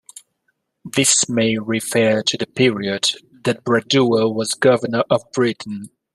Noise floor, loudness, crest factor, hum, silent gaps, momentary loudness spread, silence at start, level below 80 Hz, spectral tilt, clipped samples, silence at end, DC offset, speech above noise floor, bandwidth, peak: -70 dBFS; -18 LUFS; 18 dB; none; none; 9 LU; 0.85 s; -60 dBFS; -3.5 dB/octave; under 0.1%; 0.25 s; under 0.1%; 52 dB; 14 kHz; -2 dBFS